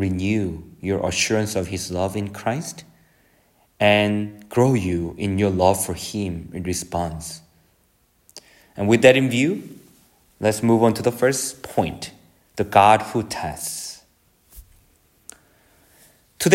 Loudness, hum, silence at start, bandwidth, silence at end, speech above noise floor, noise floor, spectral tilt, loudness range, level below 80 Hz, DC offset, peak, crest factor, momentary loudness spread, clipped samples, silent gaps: -21 LUFS; none; 0 s; 16.5 kHz; 0 s; 42 dB; -62 dBFS; -5 dB/octave; 6 LU; -50 dBFS; under 0.1%; 0 dBFS; 22 dB; 16 LU; under 0.1%; none